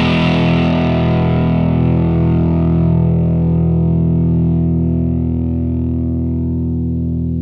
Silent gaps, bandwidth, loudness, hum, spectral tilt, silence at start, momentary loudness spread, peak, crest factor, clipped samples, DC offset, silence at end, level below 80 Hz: none; 5.6 kHz; -15 LUFS; none; -9.5 dB/octave; 0 s; 5 LU; -4 dBFS; 10 dB; under 0.1%; under 0.1%; 0 s; -26 dBFS